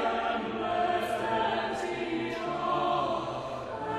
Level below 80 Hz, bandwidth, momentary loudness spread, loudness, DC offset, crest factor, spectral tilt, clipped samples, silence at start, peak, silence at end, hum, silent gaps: -58 dBFS; 12.5 kHz; 6 LU; -31 LUFS; under 0.1%; 14 dB; -5 dB/octave; under 0.1%; 0 s; -16 dBFS; 0 s; none; none